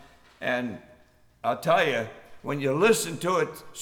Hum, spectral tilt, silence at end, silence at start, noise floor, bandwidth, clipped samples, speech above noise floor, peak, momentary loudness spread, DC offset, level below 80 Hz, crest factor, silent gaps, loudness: none; -4 dB/octave; 0 s; 0 s; -58 dBFS; 20 kHz; under 0.1%; 32 dB; -8 dBFS; 14 LU; under 0.1%; -64 dBFS; 20 dB; none; -26 LUFS